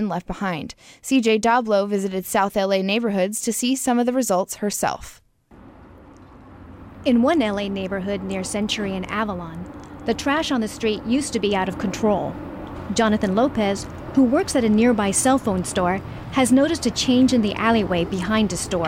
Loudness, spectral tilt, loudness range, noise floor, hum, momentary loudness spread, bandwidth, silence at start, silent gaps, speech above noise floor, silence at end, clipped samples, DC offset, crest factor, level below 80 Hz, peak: -21 LUFS; -4.5 dB/octave; 6 LU; -48 dBFS; none; 9 LU; 16 kHz; 0 s; none; 27 dB; 0 s; under 0.1%; under 0.1%; 14 dB; -46 dBFS; -6 dBFS